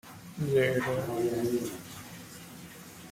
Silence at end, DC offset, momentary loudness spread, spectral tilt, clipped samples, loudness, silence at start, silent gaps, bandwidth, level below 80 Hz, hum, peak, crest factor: 0 s; under 0.1%; 19 LU; -5.5 dB/octave; under 0.1%; -30 LUFS; 0.05 s; none; 16.5 kHz; -64 dBFS; none; -14 dBFS; 18 dB